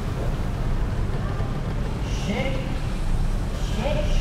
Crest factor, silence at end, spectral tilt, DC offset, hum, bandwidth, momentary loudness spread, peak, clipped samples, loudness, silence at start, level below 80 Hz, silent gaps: 12 dB; 0 s; -6.5 dB/octave; under 0.1%; none; 13 kHz; 3 LU; -10 dBFS; under 0.1%; -27 LUFS; 0 s; -26 dBFS; none